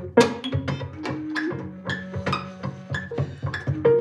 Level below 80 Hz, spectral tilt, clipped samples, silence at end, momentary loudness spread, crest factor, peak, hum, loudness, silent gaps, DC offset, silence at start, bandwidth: -52 dBFS; -6 dB/octave; under 0.1%; 0 s; 11 LU; 22 dB; -2 dBFS; none; -27 LUFS; none; under 0.1%; 0 s; 12 kHz